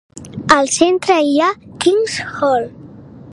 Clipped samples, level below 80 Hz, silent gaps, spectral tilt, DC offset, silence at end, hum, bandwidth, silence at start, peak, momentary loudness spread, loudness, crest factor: under 0.1%; -50 dBFS; none; -3.5 dB/octave; under 0.1%; 0 s; none; 11.5 kHz; 0.15 s; 0 dBFS; 10 LU; -15 LUFS; 16 dB